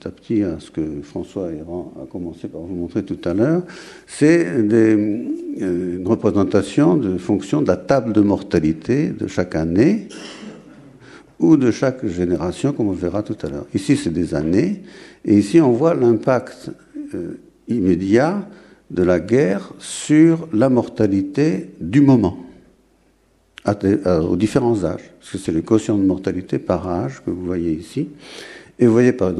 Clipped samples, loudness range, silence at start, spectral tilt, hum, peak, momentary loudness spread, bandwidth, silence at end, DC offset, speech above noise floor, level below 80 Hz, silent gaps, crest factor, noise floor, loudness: under 0.1%; 4 LU; 0.05 s; -7.5 dB/octave; none; -2 dBFS; 16 LU; 11.5 kHz; 0 s; under 0.1%; 40 dB; -48 dBFS; none; 16 dB; -58 dBFS; -18 LUFS